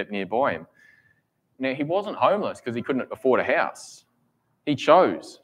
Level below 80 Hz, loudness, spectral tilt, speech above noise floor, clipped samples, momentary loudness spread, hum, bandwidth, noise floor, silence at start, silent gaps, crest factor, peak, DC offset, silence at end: -72 dBFS; -23 LUFS; -5.5 dB/octave; 46 dB; under 0.1%; 13 LU; none; 12 kHz; -70 dBFS; 0 s; none; 22 dB; -2 dBFS; under 0.1%; 0.1 s